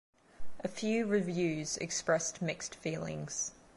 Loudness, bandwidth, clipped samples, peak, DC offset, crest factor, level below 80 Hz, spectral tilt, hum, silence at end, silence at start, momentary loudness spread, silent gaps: -35 LUFS; 11.5 kHz; under 0.1%; -18 dBFS; under 0.1%; 18 dB; -64 dBFS; -4 dB/octave; none; 0 s; 0.3 s; 8 LU; none